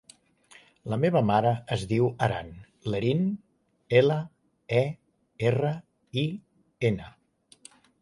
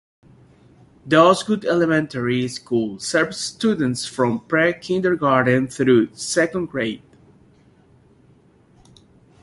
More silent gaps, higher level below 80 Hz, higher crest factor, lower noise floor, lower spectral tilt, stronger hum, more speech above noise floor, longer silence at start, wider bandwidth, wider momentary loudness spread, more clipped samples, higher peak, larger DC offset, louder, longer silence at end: neither; about the same, -58 dBFS vs -58 dBFS; about the same, 20 dB vs 20 dB; about the same, -57 dBFS vs -54 dBFS; first, -7.5 dB/octave vs -5 dB/octave; neither; about the same, 32 dB vs 35 dB; second, 0.85 s vs 1.05 s; about the same, 11.5 kHz vs 11.5 kHz; first, 16 LU vs 8 LU; neither; second, -8 dBFS vs -2 dBFS; neither; second, -27 LUFS vs -19 LUFS; second, 0.95 s vs 2.45 s